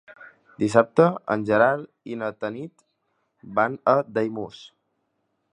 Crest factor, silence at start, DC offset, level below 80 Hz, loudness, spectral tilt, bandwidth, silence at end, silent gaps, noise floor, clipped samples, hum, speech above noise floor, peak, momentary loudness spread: 24 dB; 0.1 s; under 0.1%; -66 dBFS; -23 LUFS; -7 dB/octave; 10.5 kHz; 0.85 s; none; -74 dBFS; under 0.1%; none; 51 dB; 0 dBFS; 16 LU